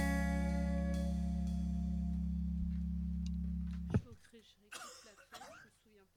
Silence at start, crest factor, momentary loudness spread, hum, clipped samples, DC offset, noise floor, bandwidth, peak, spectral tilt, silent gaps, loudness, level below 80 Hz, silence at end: 0 s; 18 dB; 19 LU; none; under 0.1%; under 0.1%; -68 dBFS; 15 kHz; -22 dBFS; -7 dB/octave; none; -39 LUFS; -42 dBFS; 0.5 s